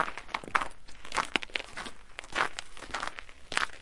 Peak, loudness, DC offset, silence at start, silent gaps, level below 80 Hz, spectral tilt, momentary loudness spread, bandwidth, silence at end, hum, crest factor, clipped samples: -4 dBFS; -34 LUFS; under 0.1%; 0 s; none; -54 dBFS; -1.5 dB/octave; 12 LU; 11.5 kHz; 0 s; none; 32 dB; under 0.1%